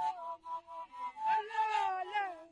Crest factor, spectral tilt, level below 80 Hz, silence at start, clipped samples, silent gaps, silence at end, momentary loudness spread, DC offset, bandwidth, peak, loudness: 14 dB; -1.5 dB/octave; -80 dBFS; 0 s; under 0.1%; none; 0.05 s; 11 LU; under 0.1%; 9.8 kHz; -22 dBFS; -36 LUFS